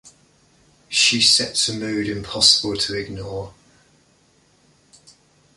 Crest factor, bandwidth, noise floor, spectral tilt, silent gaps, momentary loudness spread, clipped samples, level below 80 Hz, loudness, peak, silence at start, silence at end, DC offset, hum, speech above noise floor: 24 dB; 12 kHz; -58 dBFS; -1.5 dB/octave; none; 17 LU; under 0.1%; -52 dBFS; -17 LUFS; 0 dBFS; 0.05 s; 2.05 s; under 0.1%; none; 38 dB